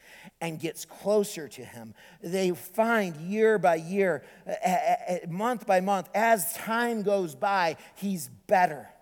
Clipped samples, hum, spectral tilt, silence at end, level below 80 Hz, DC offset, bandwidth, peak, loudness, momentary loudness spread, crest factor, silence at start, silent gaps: under 0.1%; none; -4.5 dB/octave; 0.15 s; -74 dBFS; under 0.1%; 19.5 kHz; -10 dBFS; -27 LUFS; 12 LU; 18 dB; 0.1 s; none